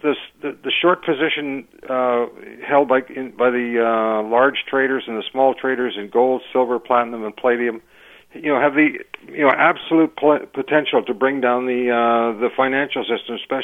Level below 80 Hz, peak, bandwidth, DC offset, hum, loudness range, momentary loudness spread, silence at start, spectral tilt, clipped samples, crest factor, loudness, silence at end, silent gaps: -66 dBFS; 0 dBFS; 3.9 kHz; under 0.1%; none; 2 LU; 9 LU; 0.05 s; -6.5 dB/octave; under 0.1%; 18 dB; -19 LUFS; 0 s; none